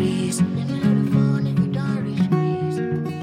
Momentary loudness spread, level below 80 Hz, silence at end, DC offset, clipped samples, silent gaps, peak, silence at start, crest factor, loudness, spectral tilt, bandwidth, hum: 5 LU; -56 dBFS; 0 s; under 0.1%; under 0.1%; none; -8 dBFS; 0 s; 14 dB; -21 LUFS; -7 dB/octave; 14.5 kHz; none